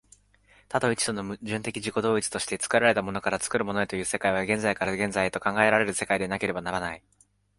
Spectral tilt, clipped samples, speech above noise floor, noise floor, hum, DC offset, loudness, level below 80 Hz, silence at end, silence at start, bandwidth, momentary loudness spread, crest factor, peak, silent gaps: -3.5 dB/octave; under 0.1%; 34 dB; -60 dBFS; 50 Hz at -50 dBFS; under 0.1%; -26 LUFS; -56 dBFS; 0.6 s; 0.7 s; 12 kHz; 9 LU; 24 dB; -4 dBFS; none